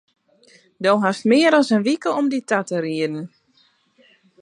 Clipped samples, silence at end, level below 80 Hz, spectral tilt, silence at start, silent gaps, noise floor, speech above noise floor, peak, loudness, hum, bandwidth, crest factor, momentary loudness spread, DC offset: under 0.1%; 1.15 s; -76 dBFS; -5 dB/octave; 0.8 s; none; -60 dBFS; 42 dB; -4 dBFS; -19 LUFS; none; 11 kHz; 18 dB; 10 LU; under 0.1%